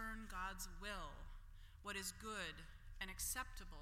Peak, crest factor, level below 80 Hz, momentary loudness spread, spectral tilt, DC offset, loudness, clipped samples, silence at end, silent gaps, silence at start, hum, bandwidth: -32 dBFS; 18 dB; -56 dBFS; 16 LU; -2 dB/octave; under 0.1%; -49 LUFS; under 0.1%; 0 s; none; 0 s; none; 16.5 kHz